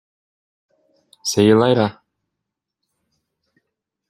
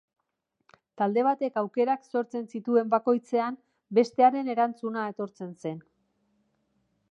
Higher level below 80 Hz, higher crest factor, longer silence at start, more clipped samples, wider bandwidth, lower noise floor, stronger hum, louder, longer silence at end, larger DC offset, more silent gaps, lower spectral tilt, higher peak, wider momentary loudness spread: first, -62 dBFS vs -84 dBFS; about the same, 20 dB vs 20 dB; first, 1.25 s vs 1 s; neither; first, 15 kHz vs 8.4 kHz; about the same, -81 dBFS vs -80 dBFS; neither; first, -17 LUFS vs -27 LUFS; first, 2.2 s vs 1.3 s; neither; neither; second, -5.5 dB/octave vs -7 dB/octave; first, -2 dBFS vs -8 dBFS; second, 10 LU vs 14 LU